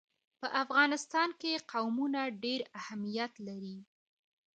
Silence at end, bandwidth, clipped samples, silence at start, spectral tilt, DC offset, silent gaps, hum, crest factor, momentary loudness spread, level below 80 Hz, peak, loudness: 0.75 s; 9 kHz; under 0.1%; 0.4 s; -3.5 dB/octave; under 0.1%; none; none; 22 dB; 15 LU; -86 dBFS; -14 dBFS; -34 LUFS